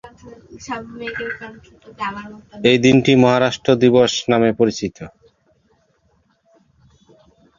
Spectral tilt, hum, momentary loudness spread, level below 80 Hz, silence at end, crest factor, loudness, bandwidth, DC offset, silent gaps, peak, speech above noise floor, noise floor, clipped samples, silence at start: -5.5 dB/octave; none; 23 LU; -52 dBFS; 2.5 s; 18 dB; -16 LUFS; 7.4 kHz; under 0.1%; none; -2 dBFS; 44 dB; -61 dBFS; under 0.1%; 0.05 s